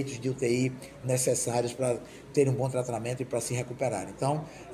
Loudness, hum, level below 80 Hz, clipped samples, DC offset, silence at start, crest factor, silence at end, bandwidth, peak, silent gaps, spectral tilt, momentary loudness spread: -30 LUFS; none; -60 dBFS; under 0.1%; under 0.1%; 0 s; 18 dB; 0 s; 16 kHz; -12 dBFS; none; -5 dB/octave; 6 LU